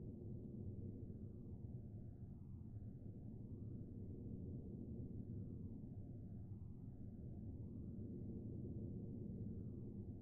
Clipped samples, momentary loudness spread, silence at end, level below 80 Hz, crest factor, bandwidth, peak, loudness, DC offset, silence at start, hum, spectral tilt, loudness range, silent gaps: under 0.1%; 5 LU; 0 s; -60 dBFS; 12 dB; 1.6 kHz; -38 dBFS; -53 LUFS; under 0.1%; 0 s; none; -15.5 dB/octave; 2 LU; none